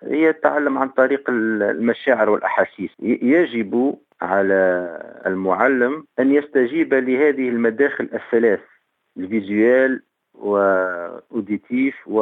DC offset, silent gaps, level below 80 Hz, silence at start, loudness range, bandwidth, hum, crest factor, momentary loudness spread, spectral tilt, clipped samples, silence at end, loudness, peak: under 0.1%; none; -72 dBFS; 0 s; 2 LU; 4 kHz; none; 18 dB; 9 LU; -8.5 dB/octave; under 0.1%; 0 s; -19 LUFS; -2 dBFS